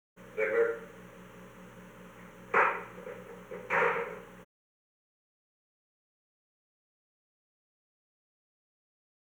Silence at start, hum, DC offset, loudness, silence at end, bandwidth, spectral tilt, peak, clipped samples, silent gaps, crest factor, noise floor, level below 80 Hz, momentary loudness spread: 0.2 s; 60 Hz at -60 dBFS; under 0.1%; -31 LUFS; 4.8 s; over 20 kHz; -5 dB/octave; -12 dBFS; under 0.1%; none; 26 dB; -51 dBFS; -72 dBFS; 23 LU